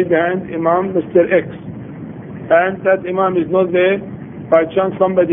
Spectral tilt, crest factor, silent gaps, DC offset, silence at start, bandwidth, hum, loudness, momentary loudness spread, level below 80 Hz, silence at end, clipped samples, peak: -10.5 dB/octave; 16 dB; none; under 0.1%; 0 s; 3.7 kHz; none; -15 LUFS; 17 LU; -52 dBFS; 0 s; under 0.1%; 0 dBFS